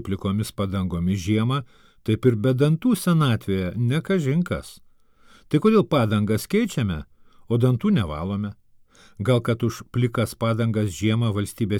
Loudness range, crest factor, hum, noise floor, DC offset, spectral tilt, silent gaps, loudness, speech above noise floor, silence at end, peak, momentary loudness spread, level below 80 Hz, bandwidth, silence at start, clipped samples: 3 LU; 16 dB; none; -53 dBFS; under 0.1%; -7 dB/octave; none; -23 LUFS; 31 dB; 0 s; -6 dBFS; 8 LU; -48 dBFS; 17.5 kHz; 0 s; under 0.1%